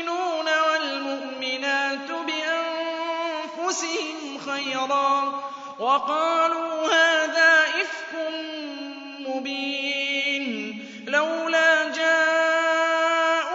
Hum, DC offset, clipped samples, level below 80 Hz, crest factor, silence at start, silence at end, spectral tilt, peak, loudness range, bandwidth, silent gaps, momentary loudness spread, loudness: none; under 0.1%; under 0.1%; -82 dBFS; 18 dB; 0 s; 0 s; -1 dB/octave; -6 dBFS; 6 LU; 7.8 kHz; none; 13 LU; -23 LUFS